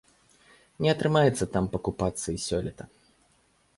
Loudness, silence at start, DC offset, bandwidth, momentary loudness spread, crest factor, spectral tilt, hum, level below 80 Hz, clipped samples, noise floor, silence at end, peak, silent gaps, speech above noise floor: -27 LUFS; 0.8 s; under 0.1%; 11.5 kHz; 14 LU; 18 dB; -5.5 dB/octave; none; -50 dBFS; under 0.1%; -66 dBFS; 0.9 s; -10 dBFS; none; 39 dB